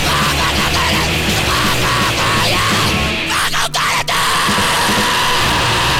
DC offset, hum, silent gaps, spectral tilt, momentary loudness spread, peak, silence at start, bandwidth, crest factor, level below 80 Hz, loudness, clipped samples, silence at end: under 0.1%; none; none; -2.5 dB/octave; 2 LU; -2 dBFS; 0 s; 18.5 kHz; 12 dB; -28 dBFS; -13 LUFS; under 0.1%; 0 s